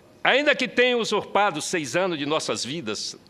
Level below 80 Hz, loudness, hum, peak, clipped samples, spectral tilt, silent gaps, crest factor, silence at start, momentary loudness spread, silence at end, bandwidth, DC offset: -68 dBFS; -23 LUFS; none; -2 dBFS; under 0.1%; -3 dB/octave; none; 22 dB; 0.25 s; 8 LU; 0.15 s; 14 kHz; under 0.1%